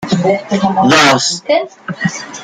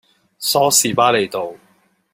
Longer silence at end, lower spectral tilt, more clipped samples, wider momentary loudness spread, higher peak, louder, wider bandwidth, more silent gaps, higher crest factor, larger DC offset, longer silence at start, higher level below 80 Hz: second, 0 s vs 0.55 s; first, -4 dB/octave vs -2 dB/octave; neither; about the same, 11 LU vs 13 LU; about the same, 0 dBFS vs 0 dBFS; first, -12 LUFS vs -16 LUFS; about the same, 15.5 kHz vs 16.5 kHz; neither; about the same, 14 dB vs 18 dB; neither; second, 0 s vs 0.4 s; first, -52 dBFS vs -62 dBFS